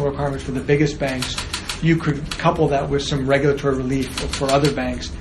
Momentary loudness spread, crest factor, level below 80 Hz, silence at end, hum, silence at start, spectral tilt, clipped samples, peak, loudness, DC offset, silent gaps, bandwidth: 7 LU; 18 dB; -34 dBFS; 0 s; none; 0 s; -5.5 dB/octave; under 0.1%; -2 dBFS; -20 LUFS; under 0.1%; none; 13 kHz